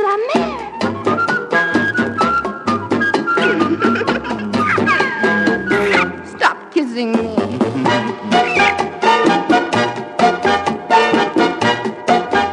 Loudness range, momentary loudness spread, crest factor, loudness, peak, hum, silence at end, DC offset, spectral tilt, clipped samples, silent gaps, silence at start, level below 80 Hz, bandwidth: 2 LU; 6 LU; 16 dB; -15 LUFS; 0 dBFS; none; 0 s; under 0.1%; -5 dB/octave; under 0.1%; none; 0 s; -50 dBFS; 11 kHz